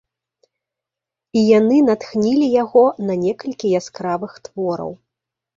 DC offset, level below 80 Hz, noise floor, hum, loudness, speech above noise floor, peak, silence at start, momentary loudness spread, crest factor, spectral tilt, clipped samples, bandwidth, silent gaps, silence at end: under 0.1%; -62 dBFS; -86 dBFS; none; -17 LUFS; 69 dB; -2 dBFS; 1.35 s; 12 LU; 16 dB; -6.5 dB/octave; under 0.1%; 7.6 kHz; none; 0.65 s